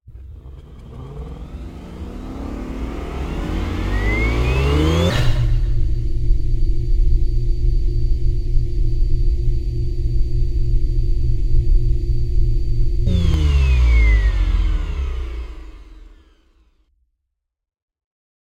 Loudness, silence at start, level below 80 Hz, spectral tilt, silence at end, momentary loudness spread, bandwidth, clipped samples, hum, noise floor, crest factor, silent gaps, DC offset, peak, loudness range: -21 LUFS; 0.1 s; -18 dBFS; -7 dB/octave; 2.3 s; 17 LU; 8 kHz; under 0.1%; none; -77 dBFS; 14 dB; none; under 0.1%; -2 dBFS; 10 LU